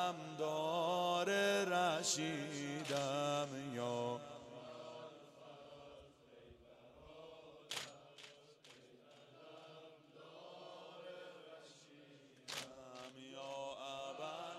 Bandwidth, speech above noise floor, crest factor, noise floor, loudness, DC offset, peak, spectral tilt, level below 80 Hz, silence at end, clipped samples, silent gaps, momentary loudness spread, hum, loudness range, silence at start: 15 kHz; 23 dB; 20 dB; -64 dBFS; -41 LUFS; under 0.1%; -24 dBFS; -3.5 dB/octave; -82 dBFS; 0 s; under 0.1%; none; 26 LU; none; 19 LU; 0 s